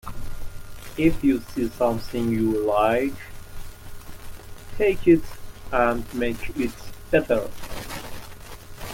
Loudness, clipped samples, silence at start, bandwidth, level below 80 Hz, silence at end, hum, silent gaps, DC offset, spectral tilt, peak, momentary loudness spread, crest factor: -23 LUFS; under 0.1%; 0.05 s; 17 kHz; -38 dBFS; 0 s; none; none; under 0.1%; -6 dB/octave; -6 dBFS; 22 LU; 18 dB